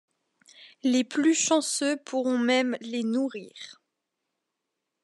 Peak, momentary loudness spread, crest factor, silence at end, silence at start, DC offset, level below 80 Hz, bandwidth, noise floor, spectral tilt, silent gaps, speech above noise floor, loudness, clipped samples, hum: -10 dBFS; 16 LU; 18 dB; 1.3 s; 0.6 s; under 0.1%; -88 dBFS; 12 kHz; -83 dBFS; -2 dB/octave; none; 57 dB; -26 LUFS; under 0.1%; none